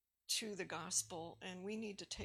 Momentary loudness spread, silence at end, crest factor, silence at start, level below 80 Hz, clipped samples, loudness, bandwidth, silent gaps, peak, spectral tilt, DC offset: 10 LU; 0 s; 22 dB; 0.3 s; -72 dBFS; under 0.1%; -43 LUFS; 17.5 kHz; none; -24 dBFS; -2 dB/octave; under 0.1%